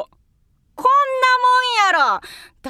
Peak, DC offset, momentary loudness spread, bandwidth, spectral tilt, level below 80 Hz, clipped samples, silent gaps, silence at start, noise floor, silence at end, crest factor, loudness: -4 dBFS; under 0.1%; 8 LU; 15 kHz; 0 dB/octave; -60 dBFS; under 0.1%; none; 0 s; -60 dBFS; 0 s; 14 dB; -16 LUFS